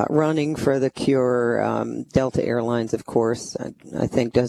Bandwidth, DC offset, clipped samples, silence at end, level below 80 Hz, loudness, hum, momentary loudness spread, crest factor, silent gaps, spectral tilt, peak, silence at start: 13 kHz; under 0.1%; under 0.1%; 0 s; -50 dBFS; -22 LUFS; none; 7 LU; 18 dB; none; -6.5 dB/octave; -4 dBFS; 0 s